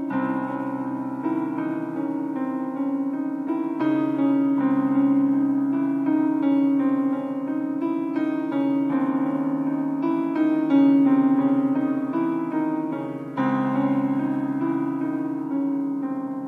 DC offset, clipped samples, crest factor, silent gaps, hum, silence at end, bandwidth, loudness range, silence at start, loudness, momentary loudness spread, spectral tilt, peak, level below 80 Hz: under 0.1%; under 0.1%; 14 dB; none; none; 0 s; 3.9 kHz; 4 LU; 0 s; -23 LUFS; 8 LU; -9 dB/octave; -8 dBFS; -76 dBFS